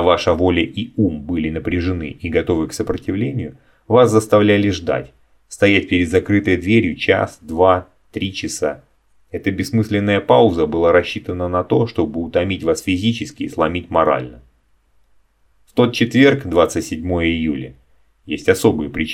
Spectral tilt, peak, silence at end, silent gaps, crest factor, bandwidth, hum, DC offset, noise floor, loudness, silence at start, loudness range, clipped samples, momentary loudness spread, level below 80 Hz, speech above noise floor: -6 dB/octave; 0 dBFS; 0 s; none; 18 dB; 16 kHz; none; under 0.1%; -58 dBFS; -17 LUFS; 0 s; 4 LU; under 0.1%; 11 LU; -42 dBFS; 41 dB